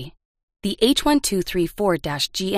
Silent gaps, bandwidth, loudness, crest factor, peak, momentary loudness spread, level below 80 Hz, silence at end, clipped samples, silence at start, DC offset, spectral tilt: 0.25-0.35 s, 0.43-0.48 s; 15.5 kHz; -21 LUFS; 18 dB; -4 dBFS; 10 LU; -42 dBFS; 0 s; under 0.1%; 0 s; under 0.1%; -4 dB/octave